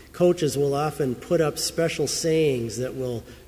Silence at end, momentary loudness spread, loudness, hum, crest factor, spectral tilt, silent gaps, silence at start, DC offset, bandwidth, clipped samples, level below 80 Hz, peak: 0.05 s; 8 LU; -24 LUFS; none; 14 dB; -5 dB/octave; none; 0 s; under 0.1%; 16 kHz; under 0.1%; -50 dBFS; -10 dBFS